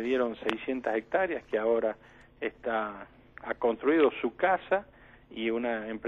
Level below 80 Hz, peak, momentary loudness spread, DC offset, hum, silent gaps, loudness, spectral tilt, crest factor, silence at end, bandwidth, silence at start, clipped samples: -62 dBFS; -8 dBFS; 12 LU; under 0.1%; none; none; -30 LUFS; -6.5 dB/octave; 22 dB; 0 s; 7 kHz; 0 s; under 0.1%